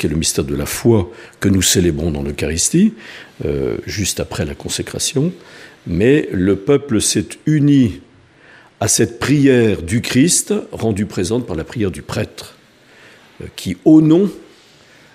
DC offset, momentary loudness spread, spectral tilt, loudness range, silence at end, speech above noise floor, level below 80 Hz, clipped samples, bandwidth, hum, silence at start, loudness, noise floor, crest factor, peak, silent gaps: under 0.1%; 12 LU; -4.5 dB/octave; 4 LU; 0.7 s; 31 dB; -38 dBFS; under 0.1%; 15.5 kHz; none; 0 s; -16 LUFS; -47 dBFS; 16 dB; 0 dBFS; none